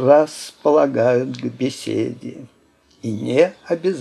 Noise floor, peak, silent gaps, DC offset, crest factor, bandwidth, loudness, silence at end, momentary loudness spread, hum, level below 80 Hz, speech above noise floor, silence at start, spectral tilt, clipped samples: -56 dBFS; 0 dBFS; none; under 0.1%; 18 dB; 13 kHz; -19 LUFS; 0 s; 13 LU; none; -70 dBFS; 37 dB; 0 s; -6 dB/octave; under 0.1%